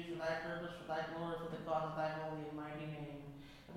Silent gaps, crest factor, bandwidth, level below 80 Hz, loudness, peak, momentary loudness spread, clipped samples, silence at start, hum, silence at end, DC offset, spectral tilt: none; 16 dB; 16.5 kHz; -66 dBFS; -43 LUFS; -26 dBFS; 9 LU; under 0.1%; 0 s; none; 0 s; under 0.1%; -6.5 dB/octave